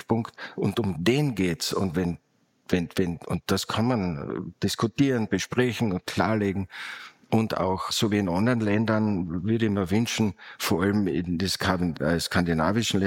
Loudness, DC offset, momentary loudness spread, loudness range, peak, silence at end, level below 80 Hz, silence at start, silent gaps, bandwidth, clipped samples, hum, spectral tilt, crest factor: -26 LUFS; under 0.1%; 6 LU; 2 LU; -6 dBFS; 0 s; -52 dBFS; 0.1 s; none; 17 kHz; under 0.1%; none; -5.5 dB/octave; 18 dB